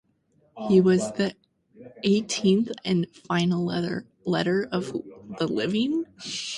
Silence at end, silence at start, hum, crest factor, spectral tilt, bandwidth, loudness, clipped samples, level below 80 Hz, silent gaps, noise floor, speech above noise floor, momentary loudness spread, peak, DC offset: 0 s; 0.55 s; none; 18 dB; -5.5 dB/octave; 11.5 kHz; -25 LUFS; under 0.1%; -64 dBFS; none; -65 dBFS; 41 dB; 11 LU; -8 dBFS; under 0.1%